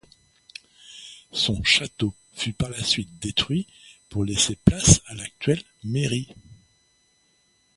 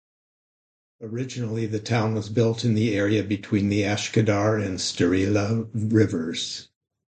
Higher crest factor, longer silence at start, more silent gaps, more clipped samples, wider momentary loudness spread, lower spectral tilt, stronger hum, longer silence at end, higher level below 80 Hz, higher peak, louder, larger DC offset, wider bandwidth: first, 26 dB vs 18 dB; about the same, 0.9 s vs 1 s; neither; neither; first, 23 LU vs 9 LU; second, -3.5 dB/octave vs -6 dB/octave; neither; first, 1.2 s vs 0.5 s; first, -40 dBFS vs -50 dBFS; first, 0 dBFS vs -6 dBFS; about the same, -23 LUFS vs -24 LUFS; neither; first, 11.5 kHz vs 9.2 kHz